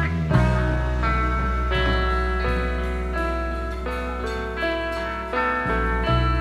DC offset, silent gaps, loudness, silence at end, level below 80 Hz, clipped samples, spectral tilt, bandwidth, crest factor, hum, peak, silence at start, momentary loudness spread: under 0.1%; none; -24 LUFS; 0 s; -26 dBFS; under 0.1%; -7 dB/octave; 10.5 kHz; 16 dB; none; -6 dBFS; 0 s; 7 LU